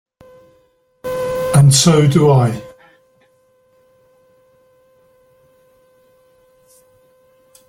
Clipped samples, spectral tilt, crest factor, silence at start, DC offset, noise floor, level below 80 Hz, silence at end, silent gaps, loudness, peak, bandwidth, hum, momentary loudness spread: under 0.1%; -5.5 dB/octave; 18 dB; 1.05 s; under 0.1%; -57 dBFS; -48 dBFS; 5 s; none; -13 LUFS; 0 dBFS; 16 kHz; none; 17 LU